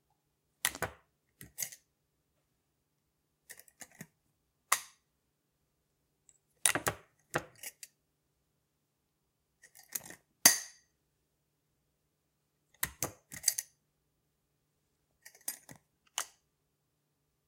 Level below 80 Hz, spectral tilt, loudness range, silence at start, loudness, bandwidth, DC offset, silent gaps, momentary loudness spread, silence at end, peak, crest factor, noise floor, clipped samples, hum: -70 dBFS; 0 dB/octave; 14 LU; 0.65 s; -33 LUFS; 16.5 kHz; under 0.1%; none; 26 LU; 1.2 s; -4 dBFS; 36 dB; -81 dBFS; under 0.1%; none